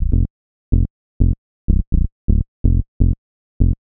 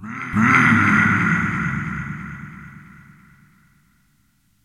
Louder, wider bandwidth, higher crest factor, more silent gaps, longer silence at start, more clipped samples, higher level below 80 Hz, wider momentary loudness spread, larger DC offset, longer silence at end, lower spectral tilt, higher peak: second, -21 LUFS vs -17 LUFS; second, 0.9 kHz vs 13 kHz; about the same, 16 dB vs 20 dB; first, 0.30-0.72 s, 0.90-1.20 s, 1.38-1.68 s, 1.87-1.92 s, 2.12-2.28 s, 2.48-2.64 s, 2.88-3.00 s, 3.18-3.60 s vs none; about the same, 0 s vs 0 s; neither; first, -18 dBFS vs -46 dBFS; second, 6 LU vs 22 LU; neither; second, 0.1 s vs 1.85 s; first, -16.5 dB/octave vs -6 dB/octave; about the same, 0 dBFS vs 0 dBFS